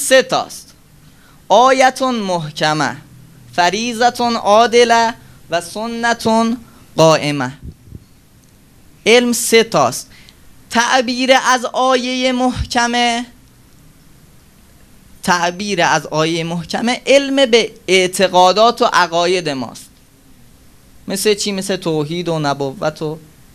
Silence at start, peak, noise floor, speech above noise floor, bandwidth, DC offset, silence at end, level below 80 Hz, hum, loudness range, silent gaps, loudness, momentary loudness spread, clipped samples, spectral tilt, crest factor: 0 s; 0 dBFS; -47 dBFS; 33 dB; 15.5 kHz; under 0.1%; 0.35 s; -44 dBFS; none; 7 LU; none; -14 LUFS; 12 LU; under 0.1%; -3.5 dB/octave; 16 dB